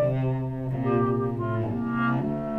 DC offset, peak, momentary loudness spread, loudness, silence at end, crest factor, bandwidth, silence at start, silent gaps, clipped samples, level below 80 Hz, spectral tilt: under 0.1%; -12 dBFS; 4 LU; -27 LUFS; 0 s; 14 dB; 4.4 kHz; 0 s; none; under 0.1%; -50 dBFS; -10.5 dB/octave